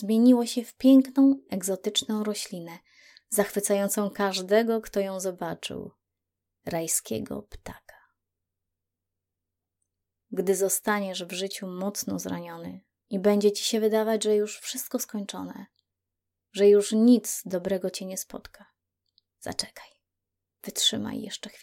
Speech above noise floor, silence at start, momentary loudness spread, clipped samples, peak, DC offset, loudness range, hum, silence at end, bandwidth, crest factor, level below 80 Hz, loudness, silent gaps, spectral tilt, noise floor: 60 dB; 0 s; 19 LU; under 0.1%; -8 dBFS; under 0.1%; 10 LU; none; 0.15 s; 17 kHz; 20 dB; -64 dBFS; -26 LUFS; none; -4 dB/octave; -86 dBFS